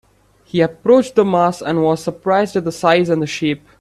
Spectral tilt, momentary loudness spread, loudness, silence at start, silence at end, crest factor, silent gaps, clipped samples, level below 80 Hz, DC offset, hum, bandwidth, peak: -6 dB/octave; 7 LU; -16 LUFS; 0.55 s; 0.25 s; 16 dB; none; under 0.1%; -54 dBFS; under 0.1%; none; 13 kHz; 0 dBFS